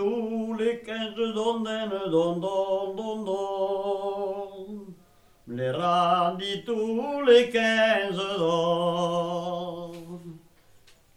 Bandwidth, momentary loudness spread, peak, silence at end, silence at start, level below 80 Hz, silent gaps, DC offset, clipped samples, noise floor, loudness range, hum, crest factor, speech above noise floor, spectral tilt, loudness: 12 kHz; 16 LU; -6 dBFS; 0.8 s; 0 s; -66 dBFS; none; under 0.1%; under 0.1%; -58 dBFS; 6 LU; none; 20 dB; 32 dB; -5.5 dB/octave; -26 LUFS